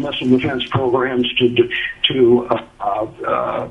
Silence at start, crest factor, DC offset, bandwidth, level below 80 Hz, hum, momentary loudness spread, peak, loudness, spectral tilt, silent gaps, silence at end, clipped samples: 0 s; 16 dB; under 0.1%; 6 kHz; -48 dBFS; none; 8 LU; 0 dBFS; -17 LUFS; -7 dB/octave; none; 0 s; under 0.1%